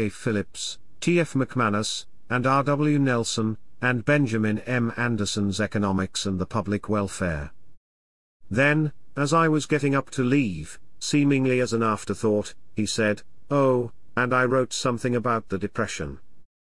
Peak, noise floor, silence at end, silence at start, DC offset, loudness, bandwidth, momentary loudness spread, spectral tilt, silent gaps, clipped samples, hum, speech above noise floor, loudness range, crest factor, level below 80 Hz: -8 dBFS; under -90 dBFS; 0.2 s; 0 s; 0.8%; -24 LUFS; 12 kHz; 9 LU; -5.5 dB/octave; 7.77-8.40 s; under 0.1%; none; over 66 dB; 3 LU; 18 dB; -54 dBFS